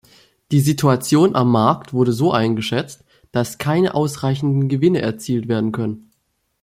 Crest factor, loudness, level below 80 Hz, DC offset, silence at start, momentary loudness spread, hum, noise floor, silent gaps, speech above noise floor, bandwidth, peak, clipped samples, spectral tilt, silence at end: 16 dB; -18 LUFS; -54 dBFS; under 0.1%; 0.5 s; 9 LU; none; -68 dBFS; none; 51 dB; 16 kHz; -2 dBFS; under 0.1%; -6.5 dB/octave; 0.65 s